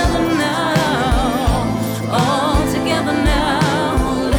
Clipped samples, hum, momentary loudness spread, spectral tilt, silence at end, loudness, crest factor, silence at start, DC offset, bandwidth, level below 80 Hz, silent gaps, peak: under 0.1%; none; 2 LU; -5.5 dB/octave; 0 s; -17 LUFS; 10 dB; 0 s; under 0.1%; 19.5 kHz; -24 dBFS; none; -6 dBFS